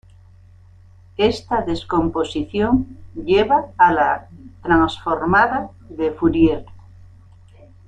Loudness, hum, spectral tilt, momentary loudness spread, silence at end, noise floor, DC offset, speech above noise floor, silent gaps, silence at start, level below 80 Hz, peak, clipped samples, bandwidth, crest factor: -18 LUFS; none; -6.5 dB/octave; 12 LU; 1.1 s; -46 dBFS; under 0.1%; 28 dB; none; 1.2 s; -42 dBFS; -2 dBFS; under 0.1%; 9 kHz; 18 dB